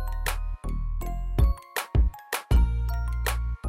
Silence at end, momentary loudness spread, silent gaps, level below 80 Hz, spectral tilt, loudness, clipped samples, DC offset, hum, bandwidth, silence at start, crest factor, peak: 0 s; 9 LU; none; -26 dBFS; -5 dB/octave; -28 LUFS; under 0.1%; under 0.1%; none; 16 kHz; 0 s; 14 dB; -12 dBFS